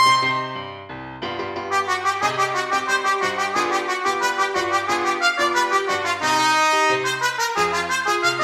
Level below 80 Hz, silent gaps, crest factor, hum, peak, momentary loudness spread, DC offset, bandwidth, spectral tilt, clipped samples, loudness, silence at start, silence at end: -60 dBFS; none; 16 dB; none; -6 dBFS; 11 LU; under 0.1%; 16.5 kHz; -2 dB/octave; under 0.1%; -20 LUFS; 0 s; 0 s